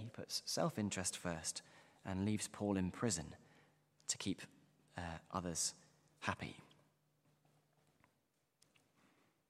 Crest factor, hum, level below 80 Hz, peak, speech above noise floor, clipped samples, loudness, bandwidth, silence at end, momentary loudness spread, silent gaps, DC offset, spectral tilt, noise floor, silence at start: 26 dB; none; -70 dBFS; -20 dBFS; 41 dB; under 0.1%; -42 LUFS; 15.5 kHz; 2.85 s; 15 LU; none; under 0.1%; -3.5 dB/octave; -83 dBFS; 0 s